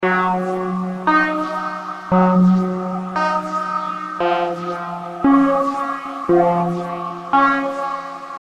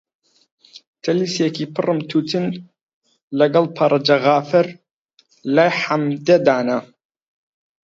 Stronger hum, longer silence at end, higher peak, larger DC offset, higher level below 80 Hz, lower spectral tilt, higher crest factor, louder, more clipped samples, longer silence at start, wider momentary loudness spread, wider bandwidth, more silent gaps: neither; second, 0 s vs 1 s; second, -4 dBFS vs 0 dBFS; neither; first, -54 dBFS vs -68 dBFS; first, -7.5 dB/octave vs -6 dB/octave; about the same, 14 dB vs 18 dB; about the same, -19 LUFS vs -18 LUFS; neither; second, 0 s vs 0.75 s; about the same, 11 LU vs 10 LU; first, 9.2 kHz vs 7.8 kHz; second, none vs 0.87-0.93 s, 2.83-2.87 s, 2.93-3.01 s, 3.23-3.28 s, 4.93-5.09 s